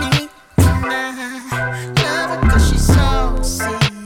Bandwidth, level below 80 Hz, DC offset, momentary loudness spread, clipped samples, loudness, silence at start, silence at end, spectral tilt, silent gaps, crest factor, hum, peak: 17 kHz; -20 dBFS; under 0.1%; 8 LU; under 0.1%; -17 LUFS; 0 s; 0 s; -5 dB/octave; none; 14 dB; none; -2 dBFS